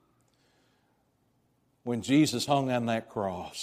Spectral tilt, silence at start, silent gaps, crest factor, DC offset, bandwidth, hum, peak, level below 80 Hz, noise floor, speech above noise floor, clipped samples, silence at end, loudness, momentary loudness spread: -5 dB/octave; 1.85 s; none; 20 dB; under 0.1%; 15.5 kHz; none; -12 dBFS; -68 dBFS; -71 dBFS; 43 dB; under 0.1%; 0 s; -28 LUFS; 10 LU